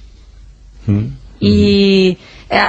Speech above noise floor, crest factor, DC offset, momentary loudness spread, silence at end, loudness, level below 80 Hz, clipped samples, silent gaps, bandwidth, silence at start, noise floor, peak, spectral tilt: 27 dB; 14 dB; under 0.1%; 16 LU; 0 s; -13 LUFS; -36 dBFS; under 0.1%; none; 8 kHz; 0.75 s; -39 dBFS; 0 dBFS; -7 dB/octave